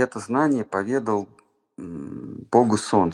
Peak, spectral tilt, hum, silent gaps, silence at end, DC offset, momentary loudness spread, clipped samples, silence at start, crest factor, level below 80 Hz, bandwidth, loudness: -2 dBFS; -6 dB/octave; none; none; 0 s; under 0.1%; 17 LU; under 0.1%; 0 s; 22 dB; -62 dBFS; 11 kHz; -22 LUFS